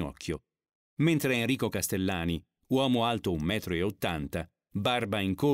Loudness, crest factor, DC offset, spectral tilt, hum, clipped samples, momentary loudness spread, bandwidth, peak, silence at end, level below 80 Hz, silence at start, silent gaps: -30 LUFS; 16 dB; under 0.1%; -5 dB/octave; none; under 0.1%; 11 LU; 16 kHz; -14 dBFS; 0 s; -52 dBFS; 0 s; 0.75-0.97 s